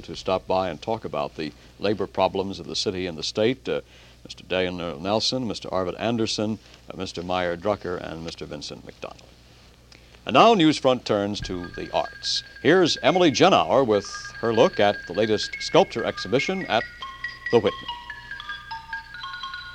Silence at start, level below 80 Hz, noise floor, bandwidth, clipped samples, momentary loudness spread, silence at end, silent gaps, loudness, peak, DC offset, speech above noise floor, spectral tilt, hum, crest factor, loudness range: 0 s; -52 dBFS; -51 dBFS; 11 kHz; under 0.1%; 16 LU; 0 s; none; -24 LUFS; -2 dBFS; under 0.1%; 28 dB; -4.5 dB/octave; none; 22 dB; 8 LU